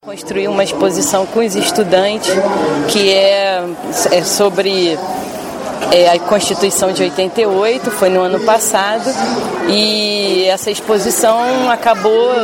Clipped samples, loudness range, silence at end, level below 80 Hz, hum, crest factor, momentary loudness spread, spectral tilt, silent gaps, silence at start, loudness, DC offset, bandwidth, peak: under 0.1%; 1 LU; 0 s; -52 dBFS; none; 14 dB; 6 LU; -3 dB/octave; none; 0.05 s; -13 LUFS; under 0.1%; 17 kHz; 0 dBFS